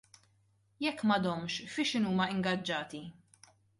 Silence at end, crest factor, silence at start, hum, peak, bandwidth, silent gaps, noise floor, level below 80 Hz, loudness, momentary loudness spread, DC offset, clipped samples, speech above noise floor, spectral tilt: 0.7 s; 18 dB; 0.8 s; none; -16 dBFS; 11.5 kHz; none; -71 dBFS; -72 dBFS; -33 LUFS; 11 LU; under 0.1%; under 0.1%; 38 dB; -5 dB/octave